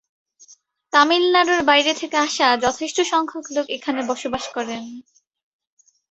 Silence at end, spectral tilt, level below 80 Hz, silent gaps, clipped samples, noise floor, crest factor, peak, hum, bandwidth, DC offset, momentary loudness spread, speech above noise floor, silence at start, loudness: 1.1 s; -1.5 dB/octave; -60 dBFS; none; under 0.1%; -52 dBFS; 20 dB; -2 dBFS; none; 8.2 kHz; under 0.1%; 12 LU; 33 dB; 0.95 s; -19 LUFS